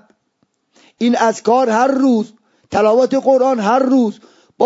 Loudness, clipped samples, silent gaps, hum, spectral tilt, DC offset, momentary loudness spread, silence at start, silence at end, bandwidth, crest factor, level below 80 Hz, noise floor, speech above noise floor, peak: -14 LUFS; under 0.1%; none; none; -5.5 dB/octave; under 0.1%; 7 LU; 1 s; 0 s; 8 kHz; 14 dB; -60 dBFS; -65 dBFS; 52 dB; 0 dBFS